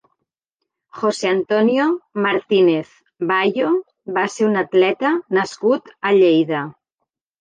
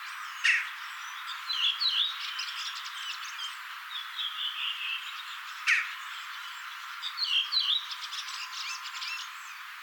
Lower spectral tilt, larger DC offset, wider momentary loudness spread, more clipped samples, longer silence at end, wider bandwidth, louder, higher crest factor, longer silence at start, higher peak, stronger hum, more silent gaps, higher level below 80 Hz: first, -5.5 dB/octave vs 11 dB/octave; neither; second, 8 LU vs 13 LU; neither; first, 0.7 s vs 0 s; second, 9.4 kHz vs over 20 kHz; first, -18 LUFS vs -31 LUFS; second, 14 dB vs 22 dB; first, 0.95 s vs 0 s; first, -4 dBFS vs -12 dBFS; neither; neither; first, -72 dBFS vs under -90 dBFS